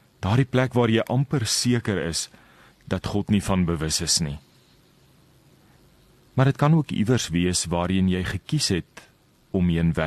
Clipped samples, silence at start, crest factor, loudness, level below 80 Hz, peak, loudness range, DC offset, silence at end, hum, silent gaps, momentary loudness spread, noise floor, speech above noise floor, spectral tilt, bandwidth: under 0.1%; 0.2 s; 18 dB; -23 LUFS; -44 dBFS; -6 dBFS; 3 LU; under 0.1%; 0 s; none; none; 8 LU; -57 dBFS; 35 dB; -5 dB/octave; 13 kHz